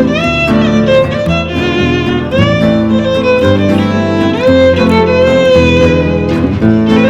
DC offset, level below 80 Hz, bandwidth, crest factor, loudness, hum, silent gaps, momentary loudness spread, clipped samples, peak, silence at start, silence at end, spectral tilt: under 0.1%; -28 dBFS; 10 kHz; 8 dB; -9 LUFS; none; none; 5 LU; under 0.1%; 0 dBFS; 0 s; 0 s; -7 dB/octave